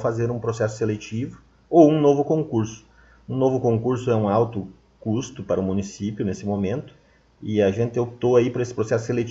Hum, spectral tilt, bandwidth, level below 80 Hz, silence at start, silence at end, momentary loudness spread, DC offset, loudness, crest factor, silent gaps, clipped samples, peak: none; -7.5 dB/octave; 7.8 kHz; -56 dBFS; 0 s; 0 s; 12 LU; under 0.1%; -22 LUFS; 20 dB; none; under 0.1%; -2 dBFS